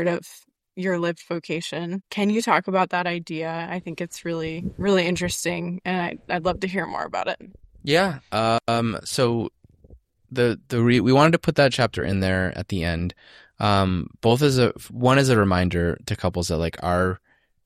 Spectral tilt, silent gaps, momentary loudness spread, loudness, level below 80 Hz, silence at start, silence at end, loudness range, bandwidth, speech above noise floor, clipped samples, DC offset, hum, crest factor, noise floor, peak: -5.5 dB/octave; none; 11 LU; -23 LUFS; -46 dBFS; 0 s; 0.5 s; 4 LU; 15 kHz; 29 dB; under 0.1%; under 0.1%; none; 20 dB; -52 dBFS; -4 dBFS